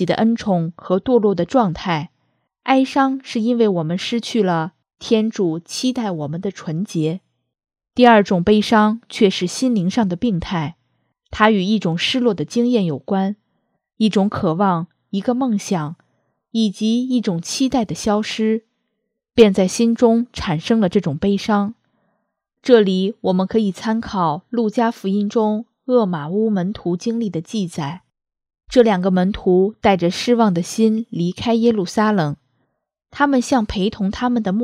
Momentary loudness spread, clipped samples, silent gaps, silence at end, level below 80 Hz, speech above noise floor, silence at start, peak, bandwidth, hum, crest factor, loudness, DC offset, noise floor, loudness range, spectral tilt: 10 LU; under 0.1%; none; 0 s; -48 dBFS; 58 dB; 0 s; 0 dBFS; 13.5 kHz; none; 18 dB; -18 LUFS; under 0.1%; -75 dBFS; 4 LU; -6 dB/octave